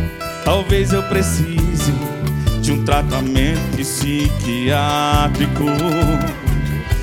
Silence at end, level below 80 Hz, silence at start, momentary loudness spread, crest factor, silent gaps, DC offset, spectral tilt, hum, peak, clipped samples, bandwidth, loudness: 0 s; -24 dBFS; 0 s; 4 LU; 16 dB; none; under 0.1%; -5.5 dB/octave; none; -2 dBFS; under 0.1%; 18 kHz; -18 LUFS